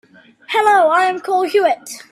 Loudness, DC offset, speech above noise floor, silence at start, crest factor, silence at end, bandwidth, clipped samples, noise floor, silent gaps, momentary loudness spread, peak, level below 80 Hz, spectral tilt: -15 LUFS; under 0.1%; 19 dB; 0.5 s; 14 dB; 0.15 s; 14 kHz; under 0.1%; -34 dBFS; none; 7 LU; -2 dBFS; -70 dBFS; -2 dB/octave